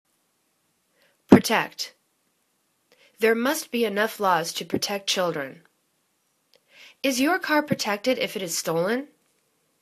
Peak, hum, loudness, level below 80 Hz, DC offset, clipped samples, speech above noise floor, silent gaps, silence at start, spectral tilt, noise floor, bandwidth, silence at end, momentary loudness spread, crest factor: 0 dBFS; none; -24 LUFS; -62 dBFS; under 0.1%; under 0.1%; 46 dB; none; 1.3 s; -4 dB/octave; -71 dBFS; 14 kHz; 0.75 s; 12 LU; 26 dB